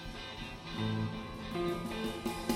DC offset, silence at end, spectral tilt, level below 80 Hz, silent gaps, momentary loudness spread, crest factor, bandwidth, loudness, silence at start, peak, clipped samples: under 0.1%; 0 s; -5.5 dB/octave; -52 dBFS; none; 7 LU; 20 dB; 17 kHz; -38 LUFS; 0 s; -18 dBFS; under 0.1%